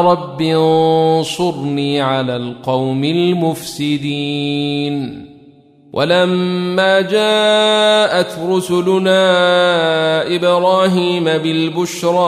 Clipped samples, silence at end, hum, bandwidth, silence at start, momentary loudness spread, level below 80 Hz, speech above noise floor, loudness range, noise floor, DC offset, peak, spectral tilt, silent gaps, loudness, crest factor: under 0.1%; 0 s; none; 15.5 kHz; 0 s; 8 LU; -58 dBFS; 31 dB; 5 LU; -45 dBFS; under 0.1%; -2 dBFS; -5 dB/octave; none; -14 LUFS; 14 dB